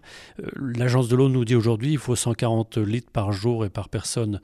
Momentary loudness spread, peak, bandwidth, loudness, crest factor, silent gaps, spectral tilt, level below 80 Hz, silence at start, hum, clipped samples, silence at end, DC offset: 10 LU; -8 dBFS; 13.5 kHz; -23 LUFS; 14 dB; none; -6 dB/octave; -50 dBFS; 0.05 s; none; under 0.1%; 0.05 s; under 0.1%